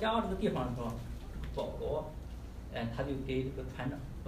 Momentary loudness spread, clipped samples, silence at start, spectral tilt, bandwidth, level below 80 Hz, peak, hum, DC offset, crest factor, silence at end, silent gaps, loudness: 11 LU; under 0.1%; 0 s; -7 dB/octave; 15.5 kHz; -46 dBFS; -20 dBFS; none; under 0.1%; 16 dB; 0 s; none; -38 LUFS